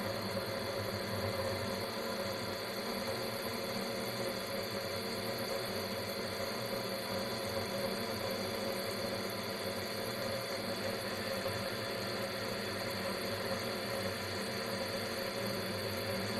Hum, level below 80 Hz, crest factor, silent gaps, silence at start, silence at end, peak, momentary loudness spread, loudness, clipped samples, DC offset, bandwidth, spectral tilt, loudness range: none; -64 dBFS; 14 dB; none; 0 s; 0 s; -24 dBFS; 1 LU; -37 LUFS; under 0.1%; under 0.1%; 16 kHz; -4 dB/octave; 0 LU